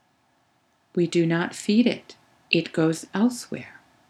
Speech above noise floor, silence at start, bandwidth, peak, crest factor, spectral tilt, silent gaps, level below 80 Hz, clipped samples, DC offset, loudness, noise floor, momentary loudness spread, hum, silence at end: 43 dB; 0.95 s; 13.5 kHz; -6 dBFS; 20 dB; -5.5 dB/octave; none; -76 dBFS; under 0.1%; under 0.1%; -24 LUFS; -66 dBFS; 13 LU; none; 0.4 s